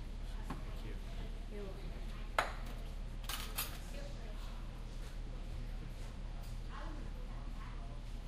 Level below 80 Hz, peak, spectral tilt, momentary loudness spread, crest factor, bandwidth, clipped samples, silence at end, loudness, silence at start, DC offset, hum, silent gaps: -44 dBFS; -16 dBFS; -4 dB/octave; 9 LU; 28 dB; 15.5 kHz; under 0.1%; 0 s; -46 LUFS; 0 s; under 0.1%; none; none